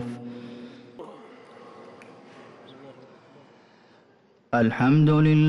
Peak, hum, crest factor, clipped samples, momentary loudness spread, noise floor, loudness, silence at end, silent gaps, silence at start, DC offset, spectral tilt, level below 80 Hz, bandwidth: -12 dBFS; none; 14 dB; under 0.1%; 29 LU; -59 dBFS; -21 LUFS; 0 s; none; 0 s; under 0.1%; -9 dB/octave; -58 dBFS; 6 kHz